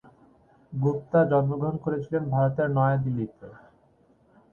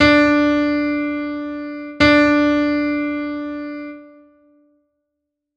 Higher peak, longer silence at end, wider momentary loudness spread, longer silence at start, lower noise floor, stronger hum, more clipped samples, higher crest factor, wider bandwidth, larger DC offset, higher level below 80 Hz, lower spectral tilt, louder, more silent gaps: second, -10 dBFS vs 0 dBFS; second, 0.95 s vs 1.5 s; second, 8 LU vs 16 LU; first, 0.7 s vs 0 s; second, -62 dBFS vs -78 dBFS; neither; neither; about the same, 18 dB vs 18 dB; second, 3.8 kHz vs 7.8 kHz; neither; second, -58 dBFS vs -42 dBFS; first, -11 dB/octave vs -5.5 dB/octave; second, -26 LUFS vs -17 LUFS; neither